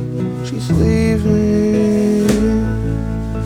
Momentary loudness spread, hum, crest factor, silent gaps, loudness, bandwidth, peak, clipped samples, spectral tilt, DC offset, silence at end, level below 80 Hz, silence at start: 7 LU; none; 14 dB; none; -16 LUFS; 15 kHz; -2 dBFS; under 0.1%; -7.5 dB/octave; under 0.1%; 0 s; -26 dBFS; 0 s